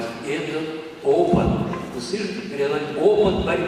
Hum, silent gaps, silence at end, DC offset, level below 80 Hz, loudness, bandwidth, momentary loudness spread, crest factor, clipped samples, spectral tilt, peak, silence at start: none; none; 0 s; under 0.1%; -42 dBFS; -22 LUFS; 12 kHz; 10 LU; 16 dB; under 0.1%; -6.5 dB/octave; -4 dBFS; 0 s